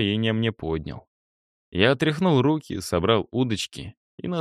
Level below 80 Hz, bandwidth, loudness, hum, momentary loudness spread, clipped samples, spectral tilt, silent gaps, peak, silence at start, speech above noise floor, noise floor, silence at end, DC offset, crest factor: -50 dBFS; 15 kHz; -24 LUFS; none; 17 LU; under 0.1%; -6 dB/octave; 1.07-1.72 s, 3.97-4.18 s; -6 dBFS; 0 s; over 67 dB; under -90 dBFS; 0 s; under 0.1%; 18 dB